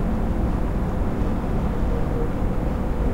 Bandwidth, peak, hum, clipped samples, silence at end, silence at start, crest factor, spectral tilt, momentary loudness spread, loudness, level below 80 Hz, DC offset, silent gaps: 13 kHz; -10 dBFS; none; under 0.1%; 0 s; 0 s; 12 dB; -9 dB/octave; 1 LU; -25 LUFS; -24 dBFS; under 0.1%; none